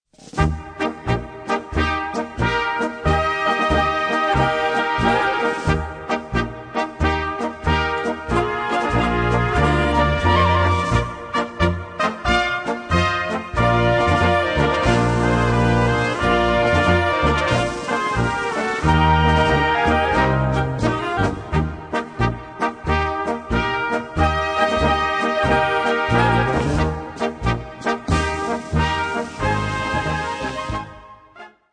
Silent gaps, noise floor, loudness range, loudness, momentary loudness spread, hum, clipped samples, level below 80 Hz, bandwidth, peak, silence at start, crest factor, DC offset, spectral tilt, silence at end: none; -43 dBFS; 5 LU; -20 LUFS; 8 LU; none; under 0.1%; -30 dBFS; 10 kHz; -2 dBFS; 0.2 s; 18 dB; under 0.1%; -6 dB/octave; 0.25 s